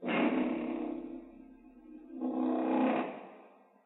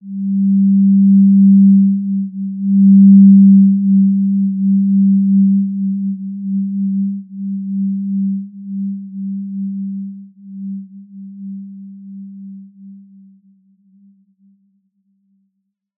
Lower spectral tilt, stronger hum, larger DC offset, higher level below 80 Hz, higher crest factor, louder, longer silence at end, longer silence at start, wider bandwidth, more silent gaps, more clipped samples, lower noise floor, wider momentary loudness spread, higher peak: second, -4.5 dB/octave vs -21 dB/octave; neither; neither; first, -70 dBFS vs -86 dBFS; about the same, 16 dB vs 12 dB; second, -33 LUFS vs -12 LUFS; second, 0.4 s vs 3.05 s; about the same, 0 s vs 0.05 s; first, 4.1 kHz vs 0.3 kHz; neither; neither; second, -59 dBFS vs -71 dBFS; about the same, 23 LU vs 23 LU; second, -18 dBFS vs -2 dBFS